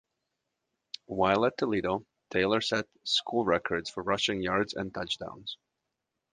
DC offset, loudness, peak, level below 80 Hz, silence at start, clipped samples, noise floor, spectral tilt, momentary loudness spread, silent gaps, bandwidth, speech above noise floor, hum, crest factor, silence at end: under 0.1%; -30 LUFS; -8 dBFS; -60 dBFS; 1.1 s; under 0.1%; -85 dBFS; -4 dB/octave; 13 LU; none; 9.8 kHz; 55 dB; none; 22 dB; 0.8 s